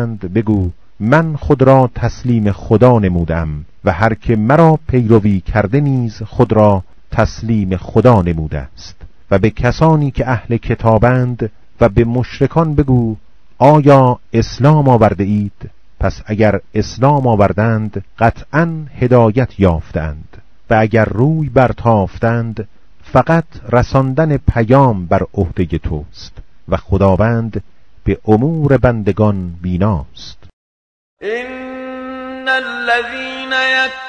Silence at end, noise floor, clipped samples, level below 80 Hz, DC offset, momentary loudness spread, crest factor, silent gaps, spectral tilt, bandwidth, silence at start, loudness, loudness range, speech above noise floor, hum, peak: 0 s; under -90 dBFS; 0.6%; -30 dBFS; 2%; 13 LU; 14 dB; 30.53-31.17 s; -8 dB/octave; 7.4 kHz; 0 s; -13 LUFS; 5 LU; over 77 dB; none; 0 dBFS